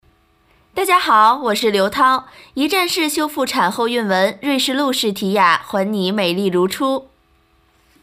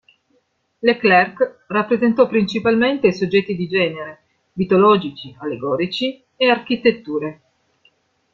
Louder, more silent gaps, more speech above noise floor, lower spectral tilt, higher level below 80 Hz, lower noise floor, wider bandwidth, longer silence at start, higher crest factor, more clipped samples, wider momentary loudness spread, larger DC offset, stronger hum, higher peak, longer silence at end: about the same, -16 LUFS vs -18 LUFS; neither; second, 40 dB vs 47 dB; second, -3.5 dB/octave vs -6.5 dB/octave; about the same, -58 dBFS vs -58 dBFS; second, -57 dBFS vs -65 dBFS; first, 16 kHz vs 7.4 kHz; about the same, 0.75 s vs 0.85 s; about the same, 16 dB vs 18 dB; neither; second, 8 LU vs 13 LU; neither; neither; about the same, -2 dBFS vs -2 dBFS; about the same, 1 s vs 1 s